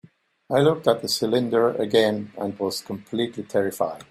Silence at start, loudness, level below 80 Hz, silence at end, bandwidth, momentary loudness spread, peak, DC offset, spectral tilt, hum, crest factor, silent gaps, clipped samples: 0.5 s; -23 LUFS; -64 dBFS; 0.05 s; 16 kHz; 8 LU; -4 dBFS; under 0.1%; -5 dB/octave; none; 18 dB; none; under 0.1%